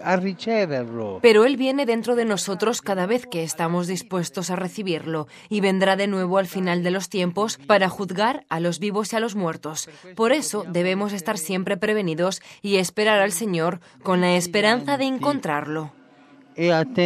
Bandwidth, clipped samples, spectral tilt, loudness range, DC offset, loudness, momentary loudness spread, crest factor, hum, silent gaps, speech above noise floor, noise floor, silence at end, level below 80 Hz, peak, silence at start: 14.5 kHz; under 0.1%; -4.5 dB/octave; 3 LU; under 0.1%; -22 LUFS; 8 LU; 20 dB; none; none; 29 dB; -51 dBFS; 0 s; -70 dBFS; -2 dBFS; 0 s